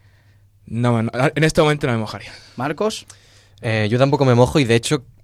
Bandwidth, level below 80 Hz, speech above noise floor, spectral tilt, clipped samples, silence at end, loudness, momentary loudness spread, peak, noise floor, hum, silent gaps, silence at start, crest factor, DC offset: 14 kHz; -44 dBFS; 34 dB; -6 dB/octave; under 0.1%; 0.2 s; -18 LUFS; 15 LU; -2 dBFS; -52 dBFS; none; none; 0.7 s; 16 dB; under 0.1%